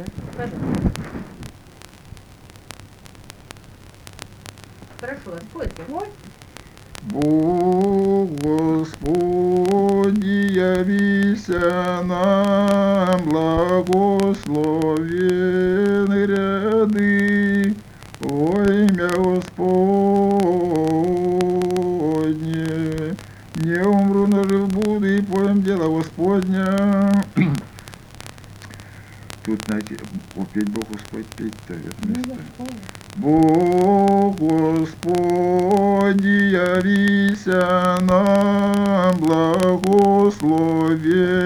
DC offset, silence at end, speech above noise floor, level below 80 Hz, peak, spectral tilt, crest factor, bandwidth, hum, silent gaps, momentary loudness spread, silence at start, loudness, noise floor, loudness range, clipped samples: under 0.1%; 0 s; 26 dB; -44 dBFS; 0 dBFS; -7 dB/octave; 18 dB; 13.5 kHz; none; none; 16 LU; 0 s; -18 LUFS; -44 dBFS; 12 LU; under 0.1%